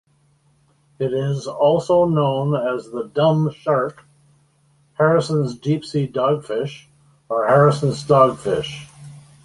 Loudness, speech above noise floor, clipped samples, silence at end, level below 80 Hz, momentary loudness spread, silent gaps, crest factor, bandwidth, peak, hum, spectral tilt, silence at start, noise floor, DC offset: -19 LUFS; 41 dB; under 0.1%; 0.25 s; -56 dBFS; 12 LU; none; 18 dB; 11.5 kHz; -2 dBFS; none; -7 dB/octave; 1 s; -59 dBFS; under 0.1%